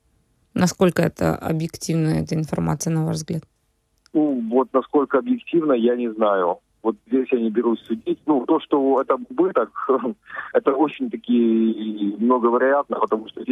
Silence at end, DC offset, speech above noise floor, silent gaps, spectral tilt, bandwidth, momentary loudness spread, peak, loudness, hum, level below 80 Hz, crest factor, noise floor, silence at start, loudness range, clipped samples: 0 s; under 0.1%; 47 dB; none; -6.5 dB/octave; 14.5 kHz; 7 LU; -4 dBFS; -21 LUFS; none; -54 dBFS; 16 dB; -67 dBFS; 0.55 s; 2 LU; under 0.1%